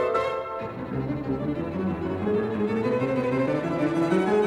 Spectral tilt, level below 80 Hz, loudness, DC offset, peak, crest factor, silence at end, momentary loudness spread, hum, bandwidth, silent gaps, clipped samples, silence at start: -8 dB/octave; -52 dBFS; -26 LUFS; under 0.1%; -10 dBFS; 16 dB; 0 s; 7 LU; none; 11.5 kHz; none; under 0.1%; 0 s